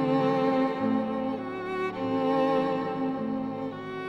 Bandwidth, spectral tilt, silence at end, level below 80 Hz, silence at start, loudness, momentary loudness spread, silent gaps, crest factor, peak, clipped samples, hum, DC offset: 7.2 kHz; -8 dB/octave; 0 s; -66 dBFS; 0 s; -28 LUFS; 8 LU; none; 14 dB; -14 dBFS; under 0.1%; none; under 0.1%